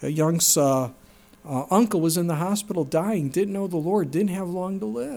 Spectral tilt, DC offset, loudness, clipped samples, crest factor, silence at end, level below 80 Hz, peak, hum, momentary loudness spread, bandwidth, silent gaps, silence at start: -5 dB/octave; under 0.1%; -23 LUFS; under 0.1%; 16 dB; 0 s; -62 dBFS; -6 dBFS; none; 10 LU; 19 kHz; none; 0 s